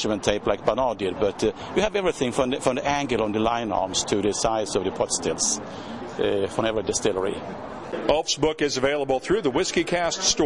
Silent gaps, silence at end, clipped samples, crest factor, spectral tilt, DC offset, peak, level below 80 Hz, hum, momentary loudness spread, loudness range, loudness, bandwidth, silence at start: none; 0 s; under 0.1%; 18 dB; -3 dB/octave; 0.2%; -6 dBFS; -48 dBFS; none; 5 LU; 2 LU; -24 LUFS; 11.5 kHz; 0 s